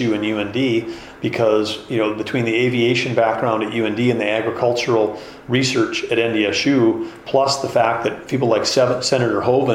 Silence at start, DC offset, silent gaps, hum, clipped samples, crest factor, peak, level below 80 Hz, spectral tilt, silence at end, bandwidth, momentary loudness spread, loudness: 0 s; under 0.1%; none; none; under 0.1%; 16 dB; -4 dBFS; -54 dBFS; -5 dB/octave; 0 s; 13.5 kHz; 6 LU; -18 LUFS